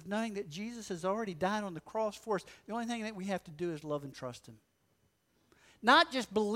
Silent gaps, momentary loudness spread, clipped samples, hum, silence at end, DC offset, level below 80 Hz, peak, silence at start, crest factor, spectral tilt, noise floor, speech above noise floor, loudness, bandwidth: none; 16 LU; under 0.1%; none; 0 s; under 0.1%; -70 dBFS; -12 dBFS; 0 s; 24 dB; -4.5 dB/octave; -75 dBFS; 40 dB; -34 LUFS; 16 kHz